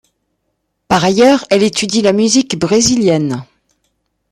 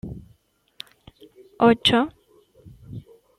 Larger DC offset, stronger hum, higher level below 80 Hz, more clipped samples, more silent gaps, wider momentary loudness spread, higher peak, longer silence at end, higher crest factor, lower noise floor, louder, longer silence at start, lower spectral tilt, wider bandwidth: neither; neither; about the same, -48 dBFS vs -52 dBFS; neither; neither; second, 6 LU vs 25 LU; first, 0 dBFS vs -4 dBFS; first, 0.9 s vs 0.4 s; second, 14 dB vs 20 dB; first, -69 dBFS vs -61 dBFS; first, -12 LUFS vs -19 LUFS; first, 0.9 s vs 0.05 s; about the same, -4 dB/octave vs -5 dB/octave; about the same, 14 kHz vs 13 kHz